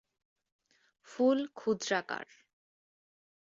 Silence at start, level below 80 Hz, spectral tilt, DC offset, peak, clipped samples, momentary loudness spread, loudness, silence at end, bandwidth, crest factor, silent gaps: 1.1 s; -82 dBFS; -4 dB/octave; under 0.1%; -16 dBFS; under 0.1%; 18 LU; -32 LUFS; 1.3 s; 7.8 kHz; 20 dB; none